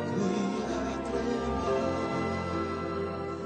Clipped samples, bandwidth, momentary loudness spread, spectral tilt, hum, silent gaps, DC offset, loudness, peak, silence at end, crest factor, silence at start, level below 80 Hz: under 0.1%; 9.4 kHz; 4 LU; -6.5 dB/octave; none; none; under 0.1%; -31 LUFS; -18 dBFS; 0 s; 14 dB; 0 s; -48 dBFS